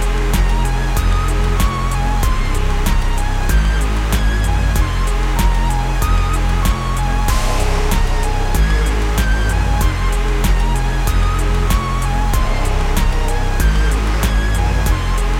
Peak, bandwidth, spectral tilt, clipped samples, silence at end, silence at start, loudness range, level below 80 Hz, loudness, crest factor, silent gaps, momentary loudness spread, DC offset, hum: -2 dBFS; 16 kHz; -5 dB/octave; under 0.1%; 0 s; 0 s; 1 LU; -16 dBFS; -18 LUFS; 12 dB; none; 2 LU; under 0.1%; none